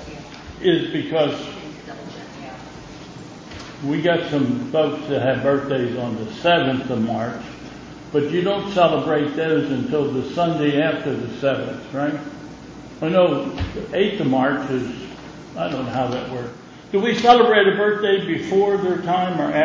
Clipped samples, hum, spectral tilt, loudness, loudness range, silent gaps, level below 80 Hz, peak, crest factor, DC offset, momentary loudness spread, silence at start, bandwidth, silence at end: under 0.1%; none; -6.5 dB/octave; -20 LUFS; 7 LU; none; -48 dBFS; 0 dBFS; 20 dB; under 0.1%; 19 LU; 0 s; 7.6 kHz; 0 s